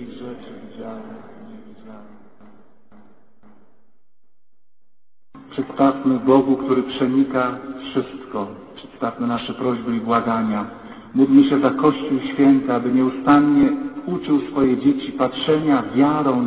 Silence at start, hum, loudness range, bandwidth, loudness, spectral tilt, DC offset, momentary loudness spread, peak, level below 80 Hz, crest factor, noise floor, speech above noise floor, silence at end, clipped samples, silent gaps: 0 s; none; 9 LU; 4 kHz; -19 LUFS; -11 dB/octave; 0.2%; 19 LU; -2 dBFS; -56 dBFS; 18 dB; -81 dBFS; 62 dB; 0 s; under 0.1%; none